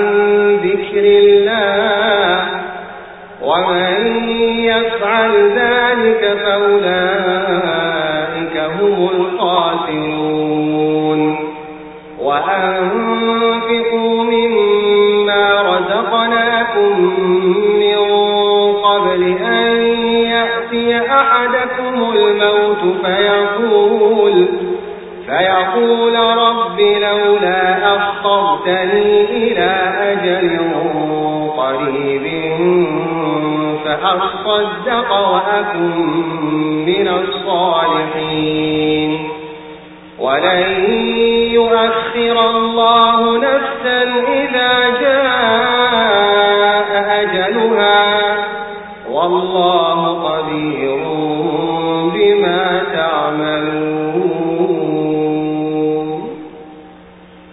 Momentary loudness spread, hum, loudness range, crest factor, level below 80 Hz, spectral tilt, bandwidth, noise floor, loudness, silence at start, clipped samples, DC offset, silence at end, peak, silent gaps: 7 LU; none; 4 LU; 14 dB; -50 dBFS; -10 dB/octave; 4 kHz; -39 dBFS; -13 LUFS; 0 s; under 0.1%; under 0.1%; 0.6 s; 0 dBFS; none